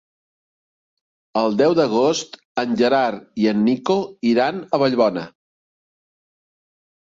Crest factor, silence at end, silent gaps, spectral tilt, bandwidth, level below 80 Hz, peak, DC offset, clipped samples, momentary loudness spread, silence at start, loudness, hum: 18 dB; 1.75 s; 2.45-2.55 s; -5.5 dB/octave; 7.8 kHz; -64 dBFS; -4 dBFS; under 0.1%; under 0.1%; 9 LU; 1.35 s; -19 LUFS; none